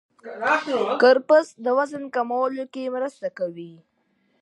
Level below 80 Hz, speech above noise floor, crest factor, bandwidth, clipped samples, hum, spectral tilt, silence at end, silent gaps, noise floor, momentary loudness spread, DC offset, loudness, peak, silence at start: -80 dBFS; 45 dB; 18 dB; 10.5 kHz; under 0.1%; none; -4.5 dB/octave; 0.7 s; none; -68 dBFS; 14 LU; under 0.1%; -22 LUFS; -4 dBFS; 0.25 s